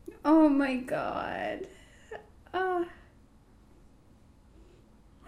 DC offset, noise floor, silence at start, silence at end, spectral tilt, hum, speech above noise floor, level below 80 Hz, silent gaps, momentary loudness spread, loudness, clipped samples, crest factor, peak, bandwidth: under 0.1%; -58 dBFS; 0.05 s; 2.35 s; -6.5 dB/octave; none; 31 dB; -58 dBFS; none; 25 LU; -29 LUFS; under 0.1%; 20 dB; -12 dBFS; 11 kHz